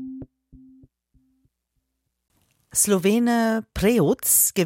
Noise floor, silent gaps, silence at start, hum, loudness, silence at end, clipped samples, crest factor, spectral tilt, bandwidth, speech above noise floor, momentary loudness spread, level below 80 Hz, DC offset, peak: -76 dBFS; none; 0 s; none; -20 LUFS; 0 s; under 0.1%; 18 dB; -4 dB/octave; 16.5 kHz; 56 dB; 9 LU; -48 dBFS; under 0.1%; -4 dBFS